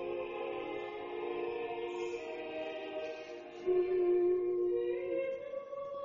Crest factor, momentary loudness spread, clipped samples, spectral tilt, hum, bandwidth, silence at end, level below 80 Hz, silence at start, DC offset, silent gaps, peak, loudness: 14 dB; 11 LU; under 0.1%; -3.5 dB/octave; none; 7.2 kHz; 0 s; -70 dBFS; 0 s; under 0.1%; none; -22 dBFS; -36 LUFS